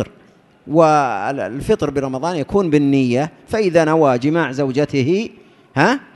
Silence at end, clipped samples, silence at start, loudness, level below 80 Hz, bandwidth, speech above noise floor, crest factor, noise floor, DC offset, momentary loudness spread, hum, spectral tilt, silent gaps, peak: 0.15 s; under 0.1%; 0 s; -17 LUFS; -46 dBFS; 12 kHz; 33 dB; 16 dB; -50 dBFS; under 0.1%; 8 LU; none; -6.5 dB/octave; none; 0 dBFS